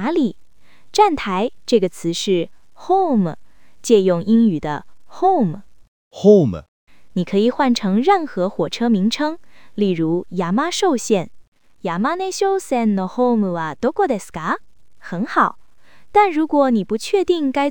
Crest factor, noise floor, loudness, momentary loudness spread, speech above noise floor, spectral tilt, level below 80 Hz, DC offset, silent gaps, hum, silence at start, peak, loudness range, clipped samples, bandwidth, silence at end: 18 dB; -51 dBFS; -18 LUFS; 10 LU; 34 dB; -5.5 dB/octave; -54 dBFS; 1%; 5.88-6.11 s, 6.68-6.87 s, 11.48-11.52 s; none; 0 s; 0 dBFS; 3 LU; under 0.1%; 19.5 kHz; 0 s